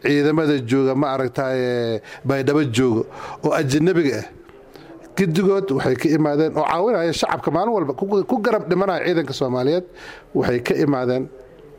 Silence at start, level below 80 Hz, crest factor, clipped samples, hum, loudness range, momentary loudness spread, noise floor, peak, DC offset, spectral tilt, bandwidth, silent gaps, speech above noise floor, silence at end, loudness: 0.05 s; -54 dBFS; 14 dB; under 0.1%; none; 2 LU; 8 LU; -43 dBFS; -6 dBFS; under 0.1%; -6.5 dB/octave; 16 kHz; none; 24 dB; 0.05 s; -20 LUFS